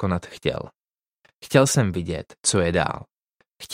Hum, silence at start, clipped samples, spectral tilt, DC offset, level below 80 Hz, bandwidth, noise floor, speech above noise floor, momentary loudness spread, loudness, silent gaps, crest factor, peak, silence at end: none; 0 s; under 0.1%; -4.5 dB/octave; under 0.1%; -48 dBFS; 16 kHz; -66 dBFS; 43 dB; 17 LU; -22 LUFS; 0.94-0.98 s, 2.39-2.43 s, 3.22-3.26 s; 22 dB; -4 dBFS; 0 s